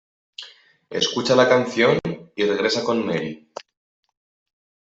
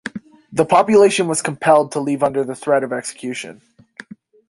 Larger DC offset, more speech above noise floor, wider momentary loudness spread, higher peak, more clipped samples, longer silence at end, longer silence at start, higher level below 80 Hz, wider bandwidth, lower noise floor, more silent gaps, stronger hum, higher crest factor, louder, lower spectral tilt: neither; first, 27 dB vs 23 dB; first, 22 LU vs 16 LU; second, -4 dBFS vs 0 dBFS; neither; first, 1.55 s vs 1 s; first, 0.4 s vs 0.05 s; about the same, -62 dBFS vs -60 dBFS; second, 8 kHz vs 11.5 kHz; first, -47 dBFS vs -40 dBFS; neither; neither; about the same, 20 dB vs 18 dB; second, -20 LUFS vs -17 LUFS; about the same, -4.5 dB/octave vs -4.5 dB/octave